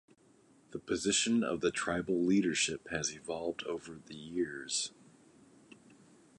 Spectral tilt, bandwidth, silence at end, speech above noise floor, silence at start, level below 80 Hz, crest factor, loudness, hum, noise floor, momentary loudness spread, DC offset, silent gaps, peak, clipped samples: -3 dB/octave; 11.5 kHz; 1.5 s; 31 dB; 0.7 s; -66 dBFS; 18 dB; -33 LUFS; none; -65 dBFS; 13 LU; under 0.1%; none; -18 dBFS; under 0.1%